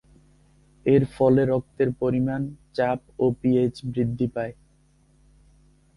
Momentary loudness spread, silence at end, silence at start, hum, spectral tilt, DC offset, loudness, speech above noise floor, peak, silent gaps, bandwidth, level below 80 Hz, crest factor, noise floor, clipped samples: 10 LU; 1.45 s; 0.85 s; none; -9 dB/octave; under 0.1%; -24 LUFS; 37 dB; -6 dBFS; none; 11 kHz; -54 dBFS; 18 dB; -60 dBFS; under 0.1%